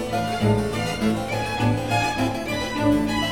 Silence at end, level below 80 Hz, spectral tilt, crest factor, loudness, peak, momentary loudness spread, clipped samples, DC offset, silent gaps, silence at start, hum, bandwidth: 0 s; -40 dBFS; -5.5 dB/octave; 14 dB; -23 LUFS; -8 dBFS; 4 LU; under 0.1%; 0.6%; none; 0 s; none; 18.5 kHz